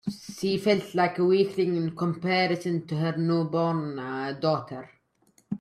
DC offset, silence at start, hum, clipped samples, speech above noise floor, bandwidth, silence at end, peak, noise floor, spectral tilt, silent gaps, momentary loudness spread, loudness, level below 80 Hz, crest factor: under 0.1%; 0.05 s; none; under 0.1%; 39 dB; 13.5 kHz; 0.05 s; -10 dBFS; -65 dBFS; -6.5 dB/octave; none; 9 LU; -26 LUFS; -68 dBFS; 16 dB